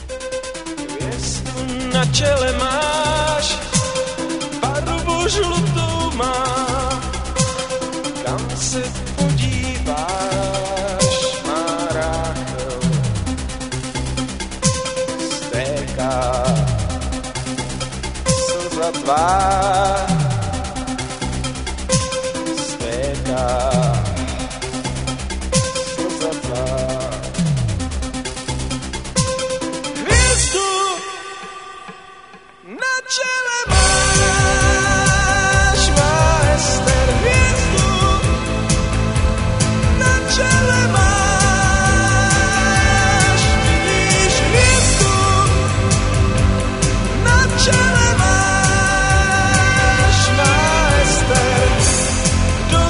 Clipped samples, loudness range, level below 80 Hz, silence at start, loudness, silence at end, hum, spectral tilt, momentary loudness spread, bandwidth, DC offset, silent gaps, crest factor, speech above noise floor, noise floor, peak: under 0.1%; 8 LU; -24 dBFS; 0 s; -17 LUFS; 0 s; none; -4 dB/octave; 11 LU; 11 kHz; 0.2%; none; 16 dB; 25 dB; -42 dBFS; 0 dBFS